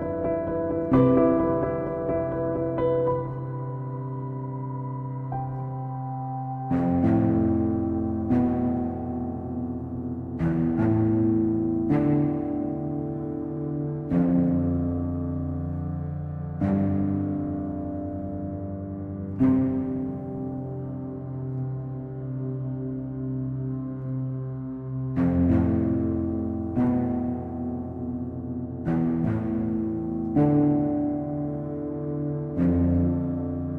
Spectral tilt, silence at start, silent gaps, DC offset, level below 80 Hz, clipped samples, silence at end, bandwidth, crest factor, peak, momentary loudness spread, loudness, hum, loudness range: -12 dB/octave; 0 s; none; under 0.1%; -46 dBFS; under 0.1%; 0 s; 3.6 kHz; 18 dB; -8 dBFS; 11 LU; -27 LUFS; none; 7 LU